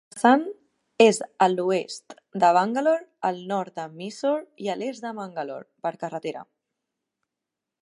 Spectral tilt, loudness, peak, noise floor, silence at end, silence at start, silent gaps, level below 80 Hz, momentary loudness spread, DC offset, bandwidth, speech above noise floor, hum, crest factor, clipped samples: -4.5 dB/octave; -24 LUFS; -4 dBFS; -86 dBFS; 1.4 s; 0.15 s; none; -80 dBFS; 16 LU; under 0.1%; 11.5 kHz; 62 dB; none; 22 dB; under 0.1%